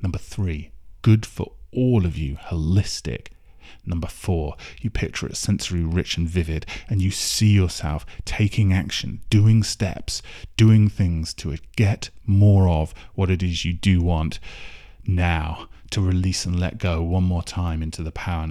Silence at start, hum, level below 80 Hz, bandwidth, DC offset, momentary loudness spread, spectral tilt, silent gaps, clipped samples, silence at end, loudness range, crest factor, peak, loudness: 0 s; none; -34 dBFS; 13.5 kHz; under 0.1%; 13 LU; -6 dB/octave; none; under 0.1%; 0 s; 6 LU; 14 dB; -6 dBFS; -22 LUFS